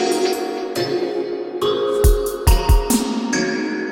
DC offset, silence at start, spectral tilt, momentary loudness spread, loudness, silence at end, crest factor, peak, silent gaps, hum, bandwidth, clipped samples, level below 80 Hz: under 0.1%; 0 s; -5 dB/octave; 6 LU; -19 LUFS; 0 s; 18 dB; 0 dBFS; none; none; 18 kHz; under 0.1%; -22 dBFS